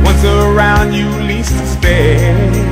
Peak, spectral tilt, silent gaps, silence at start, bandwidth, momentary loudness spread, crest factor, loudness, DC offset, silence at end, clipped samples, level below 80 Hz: 0 dBFS; -6 dB/octave; none; 0 s; 16 kHz; 5 LU; 10 dB; -11 LUFS; under 0.1%; 0 s; under 0.1%; -14 dBFS